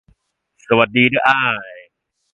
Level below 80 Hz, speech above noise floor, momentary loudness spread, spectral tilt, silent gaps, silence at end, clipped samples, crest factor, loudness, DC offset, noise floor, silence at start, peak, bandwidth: -56 dBFS; 47 dB; 11 LU; -6.5 dB/octave; none; 0.5 s; under 0.1%; 18 dB; -15 LUFS; under 0.1%; -62 dBFS; 0.7 s; 0 dBFS; 7.6 kHz